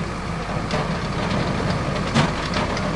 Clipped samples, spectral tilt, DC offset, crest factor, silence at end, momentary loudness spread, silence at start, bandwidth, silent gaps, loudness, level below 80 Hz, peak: under 0.1%; -5.5 dB/octave; under 0.1%; 18 dB; 0 s; 6 LU; 0 s; 11.5 kHz; none; -23 LUFS; -34 dBFS; -6 dBFS